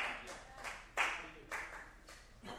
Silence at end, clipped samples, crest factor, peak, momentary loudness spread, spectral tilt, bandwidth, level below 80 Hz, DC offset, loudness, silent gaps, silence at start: 0 s; under 0.1%; 24 dB; -20 dBFS; 18 LU; -1.5 dB/octave; over 20 kHz; -62 dBFS; under 0.1%; -42 LUFS; none; 0 s